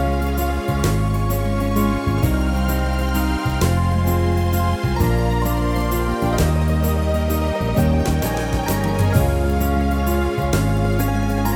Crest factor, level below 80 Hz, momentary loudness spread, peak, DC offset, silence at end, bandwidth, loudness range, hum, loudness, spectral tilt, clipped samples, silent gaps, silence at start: 14 dB; -24 dBFS; 3 LU; -4 dBFS; under 0.1%; 0 s; over 20 kHz; 1 LU; none; -20 LUFS; -6.5 dB/octave; under 0.1%; none; 0 s